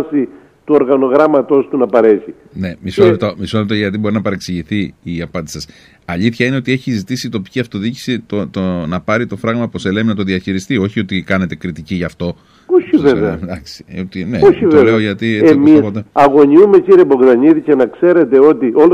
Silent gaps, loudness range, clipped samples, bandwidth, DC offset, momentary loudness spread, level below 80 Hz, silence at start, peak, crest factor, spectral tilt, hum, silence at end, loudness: none; 10 LU; under 0.1%; 13 kHz; under 0.1%; 15 LU; -44 dBFS; 0 s; 0 dBFS; 12 dB; -7 dB/octave; none; 0 s; -12 LUFS